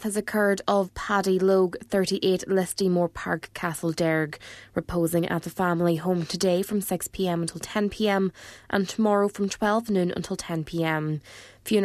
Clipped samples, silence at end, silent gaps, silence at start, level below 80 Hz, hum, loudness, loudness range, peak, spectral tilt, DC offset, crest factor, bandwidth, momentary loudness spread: under 0.1%; 0 s; none; 0 s; -54 dBFS; none; -26 LUFS; 2 LU; -8 dBFS; -5.5 dB/octave; under 0.1%; 18 dB; 14 kHz; 8 LU